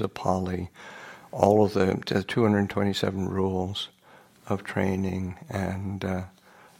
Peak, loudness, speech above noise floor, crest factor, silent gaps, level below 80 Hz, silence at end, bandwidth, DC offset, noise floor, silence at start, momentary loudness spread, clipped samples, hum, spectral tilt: -4 dBFS; -27 LUFS; 29 dB; 24 dB; none; -58 dBFS; 0.5 s; 16 kHz; under 0.1%; -55 dBFS; 0 s; 16 LU; under 0.1%; none; -6.5 dB/octave